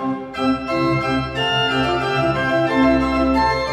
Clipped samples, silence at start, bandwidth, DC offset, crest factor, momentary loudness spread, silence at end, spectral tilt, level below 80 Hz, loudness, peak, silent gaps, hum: under 0.1%; 0 s; 11 kHz; under 0.1%; 14 dB; 5 LU; 0 s; -6 dB/octave; -36 dBFS; -18 LUFS; -4 dBFS; none; none